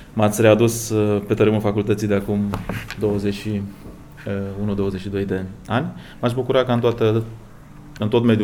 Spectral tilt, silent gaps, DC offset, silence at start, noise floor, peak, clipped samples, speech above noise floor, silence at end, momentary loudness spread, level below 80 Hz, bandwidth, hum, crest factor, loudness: -6.5 dB/octave; none; under 0.1%; 0 s; -40 dBFS; -2 dBFS; under 0.1%; 21 dB; 0 s; 11 LU; -44 dBFS; over 20 kHz; none; 20 dB; -21 LUFS